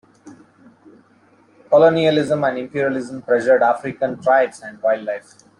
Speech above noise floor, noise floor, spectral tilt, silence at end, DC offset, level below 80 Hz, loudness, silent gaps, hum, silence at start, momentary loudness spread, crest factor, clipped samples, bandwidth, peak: 36 dB; -54 dBFS; -6 dB/octave; 0.4 s; under 0.1%; -62 dBFS; -18 LUFS; none; none; 0.25 s; 10 LU; 16 dB; under 0.1%; 11 kHz; -2 dBFS